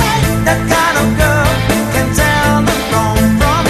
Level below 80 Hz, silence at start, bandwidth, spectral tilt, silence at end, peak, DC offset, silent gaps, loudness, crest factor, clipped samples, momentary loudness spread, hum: -22 dBFS; 0 s; 14 kHz; -5 dB/octave; 0 s; 0 dBFS; under 0.1%; none; -12 LUFS; 12 dB; under 0.1%; 2 LU; none